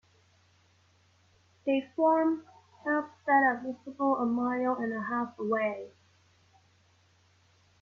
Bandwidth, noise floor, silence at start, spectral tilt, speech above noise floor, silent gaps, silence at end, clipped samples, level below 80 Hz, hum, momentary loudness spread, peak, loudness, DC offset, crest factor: 7 kHz; -66 dBFS; 1.65 s; -7 dB/octave; 37 dB; none; 1.95 s; under 0.1%; -78 dBFS; none; 13 LU; -14 dBFS; -30 LUFS; under 0.1%; 18 dB